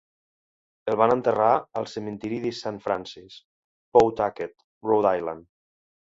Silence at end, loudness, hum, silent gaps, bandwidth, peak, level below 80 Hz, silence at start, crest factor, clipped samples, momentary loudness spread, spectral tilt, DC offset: 0.75 s; -24 LUFS; none; 3.44-3.92 s, 4.64-4.81 s; 7.8 kHz; -4 dBFS; -60 dBFS; 0.85 s; 22 dB; under 0.1%; 15 LU; -6.5 dB/octave; under 0.1%